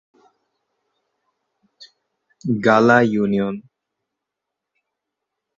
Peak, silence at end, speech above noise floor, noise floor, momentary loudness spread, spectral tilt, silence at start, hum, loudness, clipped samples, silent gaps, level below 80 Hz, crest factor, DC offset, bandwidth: 0 dBFS; 1.95 s; 66 dB; -83 dBFS; 16 LU; -7 dB/octave; 1.8 s; none; -17 LUFS; under 0.1%; none; -62 dBFS; 22 dB; under 0.1%; 7.6 kHz